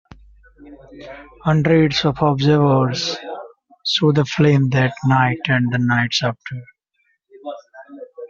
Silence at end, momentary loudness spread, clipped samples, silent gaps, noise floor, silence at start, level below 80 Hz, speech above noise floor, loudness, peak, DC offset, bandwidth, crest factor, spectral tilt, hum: 0 s; 22 LU; under 0.1%; none; -66 dBFS; 0.65 s; -50 dBFS; 49 dB; -17 LUFS; -2 dBFS; under 0.1%; 7.4 kHz; 16 dB; -5 dB/octave; none